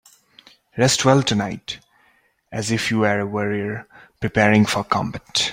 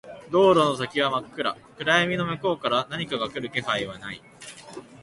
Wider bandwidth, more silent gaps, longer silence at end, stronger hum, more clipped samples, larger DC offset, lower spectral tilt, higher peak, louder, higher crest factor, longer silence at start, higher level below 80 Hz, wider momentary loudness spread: first, 16.5 kHz vs 11.5 kHz; neither; about the same, 0 s vs 0.05 s; neither; neither; neither; about the same, -4.5 dB/octave vs -5 dB/octave; first, -2 dBFS vs -6 dBFS; first, -20 LUFS vs -24 LUFS; about the same, 20 dB vs 18 dB; first, 0.75 s vs 0.05 s; first, -52 dBFS vs -60 dBFS; second, 17 LU vs 20 LU